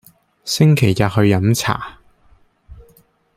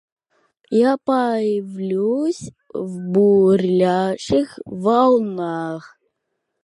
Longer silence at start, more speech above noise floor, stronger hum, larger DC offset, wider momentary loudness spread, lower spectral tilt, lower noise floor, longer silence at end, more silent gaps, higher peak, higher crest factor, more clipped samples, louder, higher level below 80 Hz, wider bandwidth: second, 0.45 s vs 0.7 s; second, 39 dB vs 58 dB; neither; neither; about the same, 14 LU vs 14 LU; second, -5.5 dB/octave vs -7 dB/octave; second, -54 dBFS vs -76 dBFS; second, 0.55 s vs 0.8 s; neither; about the same, -2 dBFS vs -4 dBFS; about the same, 16 dB vs 16 dB; neither; first, -16 LUFS vs -19 LUFS; first, -46 dBFS vs -58 dBFS; first, 16 kHz vs 11.5 kHz